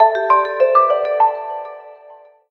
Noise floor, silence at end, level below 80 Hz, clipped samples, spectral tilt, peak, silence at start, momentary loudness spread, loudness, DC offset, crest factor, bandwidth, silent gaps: -44 dBFS; 0.35 s; -68 dBFS; under 0.1%; -4 dB/octave; 0 dBFS; 0 s; 16 LU; -15 LUFS; under 0.1%; 16 dB; 6 kHz; none